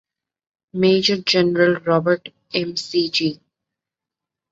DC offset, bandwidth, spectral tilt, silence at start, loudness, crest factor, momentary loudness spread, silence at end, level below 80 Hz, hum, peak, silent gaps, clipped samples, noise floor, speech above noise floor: under 0.1%; 7.8 kHz; -5 dB/octave; 0.75 s; -19 LUFS; 18 dB; 9 LU; 1.15 s; -62 dBFS; none; -4 dBFS; none; under 0.1%; -86 dBFS; 68 dB